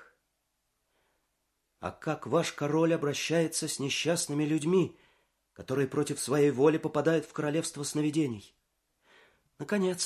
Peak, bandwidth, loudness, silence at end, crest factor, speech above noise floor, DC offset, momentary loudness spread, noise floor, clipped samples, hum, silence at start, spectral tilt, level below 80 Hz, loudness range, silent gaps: -12 dBFS; 14.5 kHz; -29 LUFS; 0 s; 20 dB; 50 dB; under 0.1%; 9 LU; -79 dBFS; under 0.1%; none; 0 s; -5 dB/octave; -68 dBFS; 3 LU; none